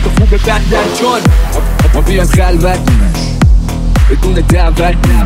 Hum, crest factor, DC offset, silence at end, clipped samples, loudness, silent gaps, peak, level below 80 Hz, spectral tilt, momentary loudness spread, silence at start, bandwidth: none; 8 dB; under 0.1%; 0 s; under 0.1%; -11 LUFS; none; 0 dBFS; -10 dBFS; -6 dB/octave; 2 LU; 0 s; 15.5 kHz